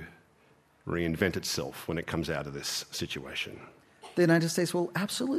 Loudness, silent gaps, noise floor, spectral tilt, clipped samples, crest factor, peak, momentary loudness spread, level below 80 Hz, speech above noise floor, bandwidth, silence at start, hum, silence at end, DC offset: -31 LUFS; none; -64 dBFS; -4.5 dB/octave; under 0.1%; 22 dB; -10 dBFS; 11 LU; -60 dBFS; 33 dB; 14.5 kHz; 0 s; none; 0 s; under 0.1%